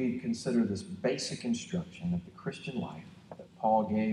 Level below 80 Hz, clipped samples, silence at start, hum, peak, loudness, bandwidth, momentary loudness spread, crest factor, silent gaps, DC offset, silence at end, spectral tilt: -66 dBFS; under 0.1%; 0 s; none; -16 dBFS; -33 LUFS; 11 kHz; 16 LU; 18 dB; none; under 0.1%; 0 s; -6 dB/octave